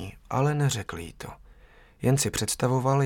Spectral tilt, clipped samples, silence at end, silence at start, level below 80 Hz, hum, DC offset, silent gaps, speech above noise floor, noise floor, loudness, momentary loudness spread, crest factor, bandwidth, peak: -5 dB/octave; under 0.1%; 0 s; 0 s; -50 dBFS; none; under 0.1%; none; 28 dB; -54 dBFS; -26 LUFS; 16 LU; 18 dB; 17.5 kHz; -10 dBFS